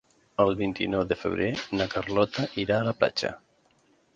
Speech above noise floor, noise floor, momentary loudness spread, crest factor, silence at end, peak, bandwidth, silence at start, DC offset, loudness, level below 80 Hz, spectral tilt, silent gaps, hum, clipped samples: 38 dB; -65 dBFS; 5 LU; 20 dB; 0.8 s; -8 dBFS; 9 kHz; 0.4 s; under 0.1%; -27 LUFS; -54 dBFS; -6 dB/octave; none; none; under 0.1%